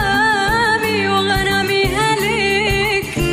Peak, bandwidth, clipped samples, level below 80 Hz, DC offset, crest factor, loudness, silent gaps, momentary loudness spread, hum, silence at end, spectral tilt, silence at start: -6 dBFS; 15.5 kHz; under 0.1%; -32 dBFS; under 0.1%; 10 dB; -15 LUFS; none; 2 LU; none; 0 s; -4 dB/octave; 0 s